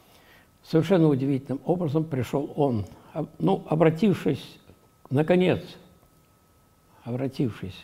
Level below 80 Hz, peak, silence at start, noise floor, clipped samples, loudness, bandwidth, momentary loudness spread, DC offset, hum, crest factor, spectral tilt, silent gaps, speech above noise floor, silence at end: -60 dBFS; -6 dBFS; 0.7 s; -60 dBFS; under 0.1%; -25 LUFS; 15 kHz; 14 LU; under 0.1%; none; 20 dB; -8 dB/octave; none; 36 dB; 0 s